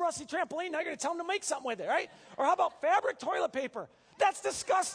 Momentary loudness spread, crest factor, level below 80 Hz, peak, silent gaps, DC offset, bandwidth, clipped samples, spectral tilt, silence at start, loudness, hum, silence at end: 7 LU; 18 dB; -74 dBFS; -14 dBFS; none; under 0.1%; 11 kHz; under 0.1%; -1.5 dB/octave; 0 s; -32 LUFS; none; 0 s